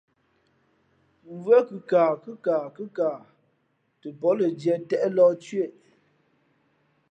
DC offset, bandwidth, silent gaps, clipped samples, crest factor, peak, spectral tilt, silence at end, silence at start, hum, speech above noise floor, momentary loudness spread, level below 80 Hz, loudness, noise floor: under 0.1%; 8.4 kHz; none; under 0.1%; 18 dB; -8 dBFS; -7.5 dB/octave; 1.4 s; 1.3 s; none; 47 dB; 15 LU; -82 dBFS; -24 LUFS; -71 dBFS